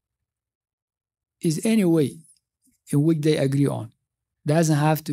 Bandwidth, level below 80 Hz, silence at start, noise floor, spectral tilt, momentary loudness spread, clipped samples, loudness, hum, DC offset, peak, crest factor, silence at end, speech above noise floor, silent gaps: 16 kHz; -68 dBFS; 1.45 s; -79 dBFS; -6.5 dB/octave; 9 LU; under 0.1%; -22 LUFS; none; under 0.1%; -6 dBFS; 18 dB; 0 s; 59 dB; none